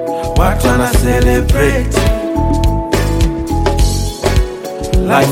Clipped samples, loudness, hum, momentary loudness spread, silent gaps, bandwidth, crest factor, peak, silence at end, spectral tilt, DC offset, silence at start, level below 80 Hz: under 0.1%; -14 LUFS; none; 5 LU; none; 16.5 kHz; 12 dB; 0 dBFS; 0 s; -5.5 dB/octave; under 0.1%; 0 s; -16 dBFS